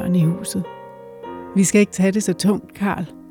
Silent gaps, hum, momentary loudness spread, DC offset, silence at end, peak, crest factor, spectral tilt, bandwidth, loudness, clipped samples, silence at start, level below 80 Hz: none; none; 19 LU; under 0.1%; 0 s; -6 dBFS; 14 dB; -5.5 dB/octave; 17.5 kHz; -19 LUFS; under 0.1%; 0 s; -56 dBFS